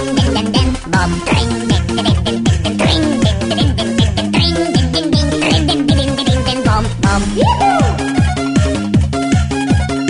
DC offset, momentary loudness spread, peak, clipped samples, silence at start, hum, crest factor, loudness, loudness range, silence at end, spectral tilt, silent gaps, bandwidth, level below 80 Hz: under 0.1%; 2 LU; 0 dBFS; under 0.1%; 0 s; none; 12 dB; -14 LUFS; 1 LU; 0 s; -5.5 dB/octave; none; 11 kHz; -24 dBFS